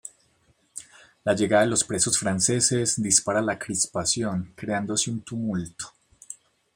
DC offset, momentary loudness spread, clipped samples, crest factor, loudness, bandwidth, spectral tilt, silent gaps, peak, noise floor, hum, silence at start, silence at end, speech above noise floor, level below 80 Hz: under 0.1%; 21 LU; under 0.1%; 22 dB; -23 LUFS; 16.5 kHz; -3 dB/octave; none; -4 dBFS; -65 dBFS; none; 0.05 s; 0.4 s; 40 dB; -60 dBFS